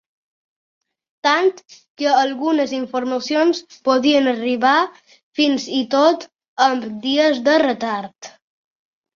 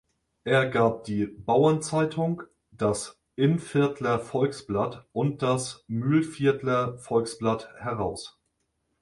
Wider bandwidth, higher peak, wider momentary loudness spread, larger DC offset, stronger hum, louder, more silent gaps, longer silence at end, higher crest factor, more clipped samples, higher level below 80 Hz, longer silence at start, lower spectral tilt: second, 7.4 kHz vs 11.5 kHz; first, -2 dBFS vs -8 dBFS; about the same, 8 LU vs 9 LU; neither; neither; first, -18 LUFS vs -26 LUFS; first, 1.90-1.95 s, 5.23-5.32 s, 6.48-6.56 s vs none; first, 0.9 s vs 0.7 s; about the same, 16 dB vs 18 dB; neither; second, -66 dBFS vs -58 dBFS; first, 1.25 s vs 0.45 s; second, -3 dB/octave vs -6 dB/octave